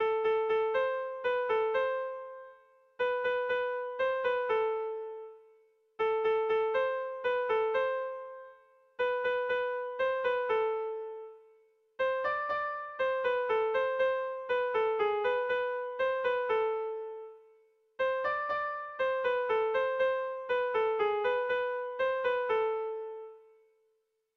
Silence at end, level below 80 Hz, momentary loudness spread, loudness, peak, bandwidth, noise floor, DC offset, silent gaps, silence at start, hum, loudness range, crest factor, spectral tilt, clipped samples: 1 s; -72 dBFS; 11 LU; -31 LUFS; -20 dBFS; 6 kHz; -77 dBFS; under 0.1%; none; 0 s; none; 3 LU; 12 dB; -4 dB/octave; under 0.1%